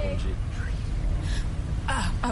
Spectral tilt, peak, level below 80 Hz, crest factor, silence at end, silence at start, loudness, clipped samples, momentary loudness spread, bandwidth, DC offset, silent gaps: -5.5 dB/octave; -14 dBFS; -28 dBFS; 14 dB; 0 s; 0 s; -30 LUFS; under 0.1%; 4 LU; 11.5 kHz; under 0.1%; none